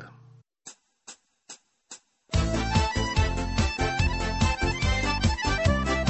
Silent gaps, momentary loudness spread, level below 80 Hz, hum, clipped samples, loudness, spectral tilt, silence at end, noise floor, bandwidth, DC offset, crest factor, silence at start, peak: none; 22 LU; -32 dBFS; none; under 0.1%; -26 LUFS; -5 dB/octave; 0 s; -55 dBFS; 8.4 kHz; under 0.1%; 16 dB; 0 s; -10 dBFS